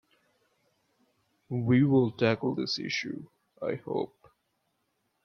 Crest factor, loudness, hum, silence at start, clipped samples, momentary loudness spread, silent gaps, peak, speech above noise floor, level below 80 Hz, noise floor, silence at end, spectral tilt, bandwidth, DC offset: 20 dB; -29 LUFS; none; 1.5 s; under 0.1%; 14 LU; none; -12 dBFS; 49 dB; -70 dBFS; -77 dBFS; 1.2 s; -6.5 dB/octave; 6.8 kHz; under 0.1%